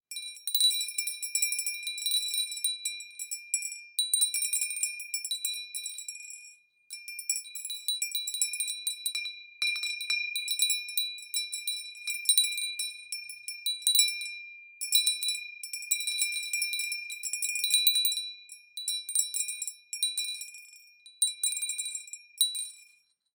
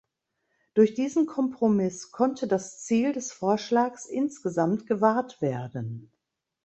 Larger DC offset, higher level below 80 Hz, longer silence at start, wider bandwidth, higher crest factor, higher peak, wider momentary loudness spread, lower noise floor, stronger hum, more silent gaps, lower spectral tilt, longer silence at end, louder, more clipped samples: neither; second, under -90 dBFS vs -70 dBFS; second, 0.1 s vs 0.75 s; first, 19 kHz vs 8.4 kHz; first, 26 dB vs 20 dB; about the same, -6 dBFS vs -6 dBFS; first, 15 LU vs 8 LU; second, -65 dBFS vs -78 dBFS; neither; neither; second, 9.5 dB/octave vs -6 dB/octave; about the same, 0.5 s vs 0.6 s; about the same, -29 LUFS vs -27 LUFS; neither